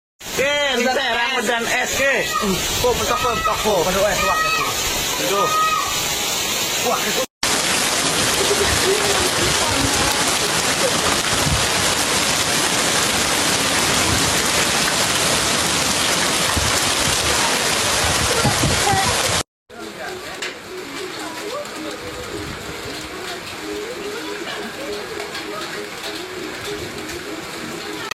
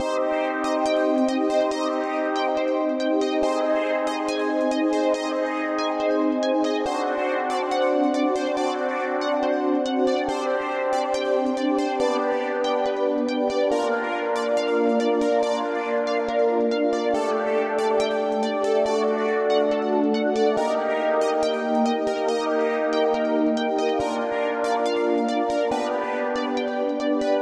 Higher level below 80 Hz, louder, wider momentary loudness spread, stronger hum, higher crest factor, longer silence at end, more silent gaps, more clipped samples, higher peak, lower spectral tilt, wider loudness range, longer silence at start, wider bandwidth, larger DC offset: first, -40 dBFS vs -62 dBFS; first, -18 LUFS vs -23 LUFS; first, 12 LU vs 3 LU; neither; about the same, 16 dB vs 12 dB; about the same, 0.05 s vs 0 s; first, 7.30-7.41 s, 19.48-19.66 s vs none; neither; first, -4 dBFS vs -10 dBFS; second, -2 dB/octave vs -4 dB/octave; first, 12 LU vs 1 LU; first, 0.2 s vs 0 s; first, 16.5 kHz vs 11.5 kHz; neither